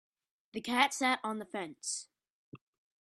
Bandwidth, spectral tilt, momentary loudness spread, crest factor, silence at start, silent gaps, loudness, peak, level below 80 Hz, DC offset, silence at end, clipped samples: 13.5 kHz; -1.5 dB/octave; 13 LU; 26 dB; 0.55 s; 2.30-2.52 s; -33 LUFS; -10 dBFS; -80 dBFS; under 0.1%; 0.45 s; under 0.1%